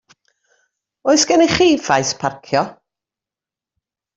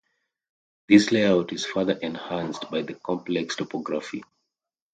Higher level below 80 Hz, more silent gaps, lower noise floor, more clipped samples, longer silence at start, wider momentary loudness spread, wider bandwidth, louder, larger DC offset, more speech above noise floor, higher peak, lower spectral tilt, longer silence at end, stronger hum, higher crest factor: first, -52 dBFS vs -64 dBFS; neither; first, -89 dBFS vs -85 dBFS; neither; first, 1.05 s vs 0.9 s; about the same, 11 LU vs 12 LU; second, 8 kHz vs 9.2 kHz; first, -16 LUFS vs -24 LUFS; neither; first, 74 dB vs 61 dB; about the same, -2 dBFS vs -4 dBFS; second, -3.5 dB/octave vs -5 dB/octave; first, 1.45 s vs 0.7 s; neither; second, 16 dB vs 22 dB